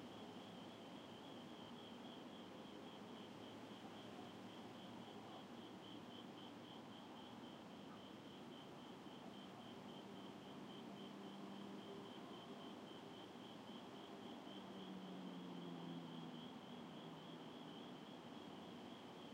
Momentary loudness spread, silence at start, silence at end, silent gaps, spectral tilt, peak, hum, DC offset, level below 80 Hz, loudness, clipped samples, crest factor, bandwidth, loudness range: 3 LU; 0 s; 0 s; none; -5.5 dB/octave; -42 dBFS; none; under 0.1%; under -90 dBFS; -56 LUFS; under 0.1%; 14 dB; 16 kHz; 3 LU